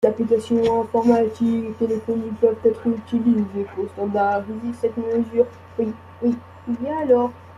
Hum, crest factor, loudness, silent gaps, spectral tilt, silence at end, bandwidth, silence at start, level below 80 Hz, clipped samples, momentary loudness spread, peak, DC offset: none; 18 dB; -22 LUFS; none; -8 dB/octave; 0 s; 10.5 kHz; 0 s; -58 dBFS; under 0.1%; 8 LU; -4 dBFS; under 0.1%